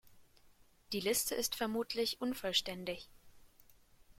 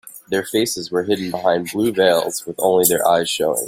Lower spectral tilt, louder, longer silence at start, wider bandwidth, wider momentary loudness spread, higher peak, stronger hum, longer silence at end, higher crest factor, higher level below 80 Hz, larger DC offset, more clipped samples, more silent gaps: about the same, -2 dB/octave vs -3 dB/octave; second, -36 LUFS vs -18 LUFS; about the same, 0.05 s vs 0.05 s; about the same, 16.5 kHz vs 16.5 kHz; first, 10 LU vs 7 LU; second, -18 dBFS vs 0 dBFS; neither; about the same, 0.05 s vs 0 s; about the same, 22 dB vs 18 dB; second, -66 dBFS vs -58 dBFS; neither; neither; neither